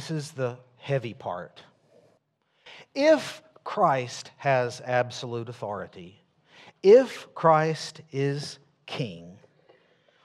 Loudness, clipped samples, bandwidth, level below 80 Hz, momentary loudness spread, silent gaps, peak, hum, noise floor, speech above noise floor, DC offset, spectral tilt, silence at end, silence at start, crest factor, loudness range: -26 LUFS; under 0.1%; 12.5 kHz; -76 dBFS; 18 LU; none; -6 dBFS; none; -70 dBFS; 45 dB; under 0.1%; -5.5 dB/octave; 0.9 s; 0 s; 22 dB; 5 LU